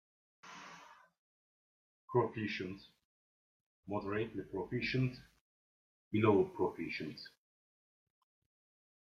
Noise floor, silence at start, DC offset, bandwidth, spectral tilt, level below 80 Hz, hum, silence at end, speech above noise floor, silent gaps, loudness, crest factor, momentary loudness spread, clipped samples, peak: -59 dBFS; 0.45 s; under 0.1%; 7 kHz; -7.5 dB/octave; -70 dBFS; none; 1.8 s; 23 dB; 1.19-2.08 s, 3.05-3.83 s, 5.41-6.11 s; -37 LUFS; 22 dB; 22 LU; under 0.1%; -18 dBFS